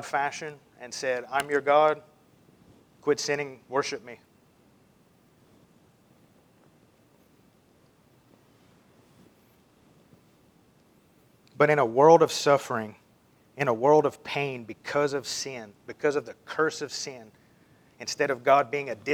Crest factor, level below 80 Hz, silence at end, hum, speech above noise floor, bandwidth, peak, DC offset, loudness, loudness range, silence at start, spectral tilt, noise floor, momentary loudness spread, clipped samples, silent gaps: 24 dB; -76 dBFS; 0 s; none; 36 dB; 17 kHz; -4 dBFS; under 0.1%; -26 LUFS; 10 LU; 0 s; -4 dB/octave; -61 dBFS; 17 LU; under 0.1%; none